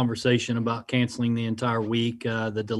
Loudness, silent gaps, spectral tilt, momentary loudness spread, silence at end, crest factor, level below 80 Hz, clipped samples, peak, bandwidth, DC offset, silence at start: -26 LUFS; none; -6 dB/octave; 4 LU; 0 s; 16 dB; -62 dBFS; under 0.1%; -8 dBFS; 11.5 kHz; under 0.1%; 0 s